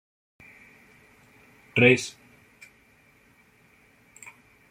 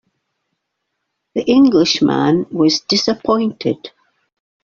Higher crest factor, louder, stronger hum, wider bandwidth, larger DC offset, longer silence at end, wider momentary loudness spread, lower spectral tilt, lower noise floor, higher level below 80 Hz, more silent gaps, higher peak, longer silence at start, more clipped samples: first, 26 dB vs 14 dB; second, -22 LUFS vs -15 LUFS; neither; first, 15.5 kHz vs 7.4 kHz; neither; first, 2.6 s vs 0.75 s; first, 28 LU vs 10 LU; about the same, -5 dB/octave vs -5 dB/octave; second, -60 dBFS vs -74 dBFS; second, -68 dBFS vs -54 dBFS; neither; about the same, -4 dBFS vs -2 dBFS; first, 1.75 s vs 1.35 s; neither